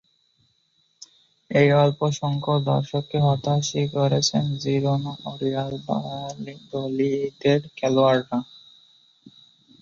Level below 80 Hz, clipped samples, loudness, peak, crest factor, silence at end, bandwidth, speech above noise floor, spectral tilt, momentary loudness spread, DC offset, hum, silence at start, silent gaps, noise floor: -60 dBFS; under 0.1%; -23 LUFS; -4 dBFS; 20 dB; 0.55 s; 7.6 kHz; 44 dB; -6 dB/octave; 12 LU; under 0.1%; none; 1.5 s; none; -67 dBFS